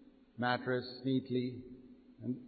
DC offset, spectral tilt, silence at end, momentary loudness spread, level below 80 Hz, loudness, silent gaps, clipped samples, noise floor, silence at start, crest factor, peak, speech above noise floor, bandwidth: under 0.1%; -4.5 dB/octave; 0 s; 20 LU; -72 dBFS; -37 LUFS; none; under 0.1%; -56 dBFS; 0 s; 20 dB; -18 dBFS; 20 dB; 4.8 kHz